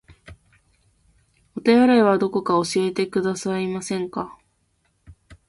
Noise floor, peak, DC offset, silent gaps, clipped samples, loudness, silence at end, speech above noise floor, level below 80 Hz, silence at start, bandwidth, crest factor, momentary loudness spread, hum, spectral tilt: -67 dBFS; -4 dBFS; under 0.1%; none; under 0.1%; -21 LUFS; 0.15 s; 48 dB; -58 dBFS; 0.3 s; 11.5 kHz; 18 dB; 14 LU; none; -5.5 dB/octave